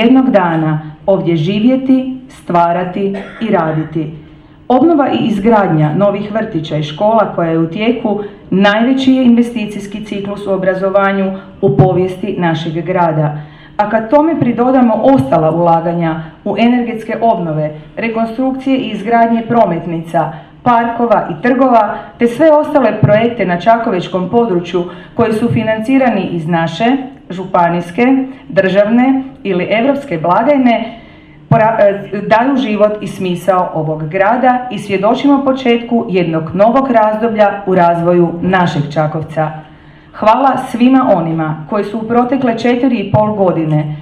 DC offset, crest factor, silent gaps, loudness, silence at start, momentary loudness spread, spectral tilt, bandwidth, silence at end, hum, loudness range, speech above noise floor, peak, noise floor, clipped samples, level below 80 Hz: under 0.1%; 12 dB; none; -12 LUFS; 0 s; 8 LU; -8 dB/octave; 11 kHz; 0 s; none; 3 LU; 26 dB; 0 dBFS; -37 dBFS; under 0.1%; -46 dBFS